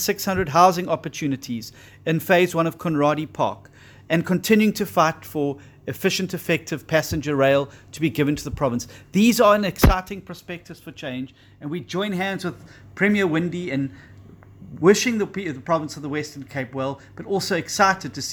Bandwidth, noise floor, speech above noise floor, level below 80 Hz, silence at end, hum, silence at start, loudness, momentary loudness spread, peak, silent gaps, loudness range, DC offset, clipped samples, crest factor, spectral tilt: over 20 kHz; -45 dBFS; 23 dB; -38 dBFS; 0 s; none; 0 s; -22 LUFS; 16 LU; -2 dBFS; none; 5 LU; under 0.1%; under 0.1%; 22 dB; -5 dB/octave